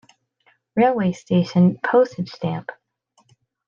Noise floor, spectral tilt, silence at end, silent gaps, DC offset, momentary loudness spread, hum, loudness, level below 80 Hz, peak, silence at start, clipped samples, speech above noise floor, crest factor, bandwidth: -64 dBFS; -8 dB/octave; 0.95 s; none; under 0.1%; 11 LU; none; -20 LUFS; -66 dBFS; -4 dBFS; 0.75 s; under 0.1%; 45 dB; 18 dB; 7.2 kHz